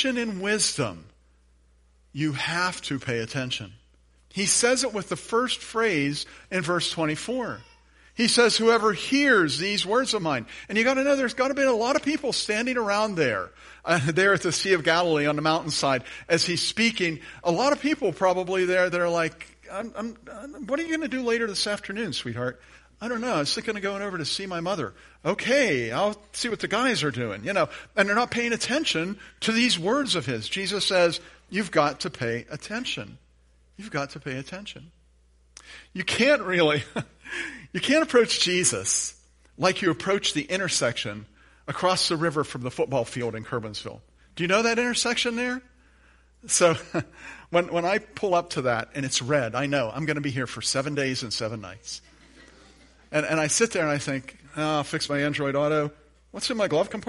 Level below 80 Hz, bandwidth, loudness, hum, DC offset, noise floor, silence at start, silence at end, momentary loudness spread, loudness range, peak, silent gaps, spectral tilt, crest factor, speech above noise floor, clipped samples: -58 dBFS; 11.5 kHz; -25 LUFS; none; under 0.1%; -60 dBFS; 0 s; 0.05 s; 13 LU; 6 LU; -4 dBFS; none; -3.5 dB/octave; 22 dB; 34 dB; under 0.1%